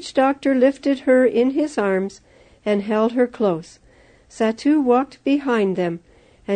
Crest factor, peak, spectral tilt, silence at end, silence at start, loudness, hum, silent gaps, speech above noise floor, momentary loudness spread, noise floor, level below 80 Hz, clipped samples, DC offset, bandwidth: 16 dB; -4 dBFS; -6.5 dB/octave; 0 s; 0 s; -19 LUFS; none; none; 33 dB; 9 LU; -52 dBFS; -58 dBFS; under 0.1%; under 0.1%; 9.4 kHz